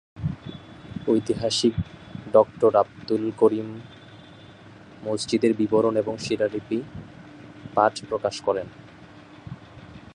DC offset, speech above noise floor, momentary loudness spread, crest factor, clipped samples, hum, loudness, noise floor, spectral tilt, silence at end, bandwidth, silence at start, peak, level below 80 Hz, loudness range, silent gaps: under 0.1%; 24 dB; 22 LU; 22 dB; under 0.1%; none; -24 LUFS; -46 dBFS; -5.5 dB/octave; 0.15 s; 11 kHz; 0.15 s; -4 dBFS; -52 dBFS; 5 LU; none